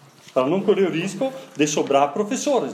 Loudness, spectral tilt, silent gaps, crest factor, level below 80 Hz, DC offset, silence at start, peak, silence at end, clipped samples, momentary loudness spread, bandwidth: -21 LUFS; -4.5 dB/octave; none; 16 dB; -76 dBFS; under 0.1%; 0.35 s; -6 dBFS; 0 s; under 0.1%; 7 LU; 14.5 kHz